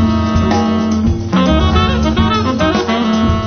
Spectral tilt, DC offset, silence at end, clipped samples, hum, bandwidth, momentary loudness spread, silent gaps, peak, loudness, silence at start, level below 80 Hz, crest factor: -6.5 dB/octave; under 0.1%; 0 s; under 0.1%; none; 6.6 kHz; 3 LU; none; -2 dBFS; -13 LUFS; 0 s; -20 dBFS; 12 dB